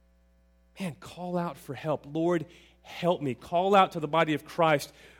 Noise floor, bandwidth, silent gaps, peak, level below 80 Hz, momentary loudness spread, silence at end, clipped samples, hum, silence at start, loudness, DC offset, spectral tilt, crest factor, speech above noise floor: -63 dBFS; 17 kHz; none; -8 dBFS; -64 dBFS; 15 LU; 0.3 s; under 0.1%; none; 0.75 s; -28 LUFS; under 0.1%; -6 dB/octave; 22 dB; 35 dB